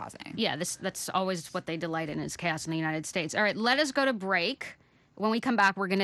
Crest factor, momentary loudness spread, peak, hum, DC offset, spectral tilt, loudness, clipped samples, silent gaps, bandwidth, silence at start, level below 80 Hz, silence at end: 20 dB; 9 LU; -10 dBFS; none; under 0.1%; -3.5 dB/octave; -29 LUFS; under 0.1%; none; 12.5 kHz; 0 s; -68 dBFS; 0 s